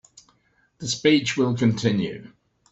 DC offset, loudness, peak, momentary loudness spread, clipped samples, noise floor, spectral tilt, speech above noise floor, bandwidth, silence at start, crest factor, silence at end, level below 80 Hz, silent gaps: under 0.1%; -22 LUFS; -4 dBFS; 13 LU; under 0.1%; -65 dBFS; -5 dB/octave; 43 dB; 8.2 kHz; 0.8 s; 20 dB; 0.45 s; -60 dBFS; none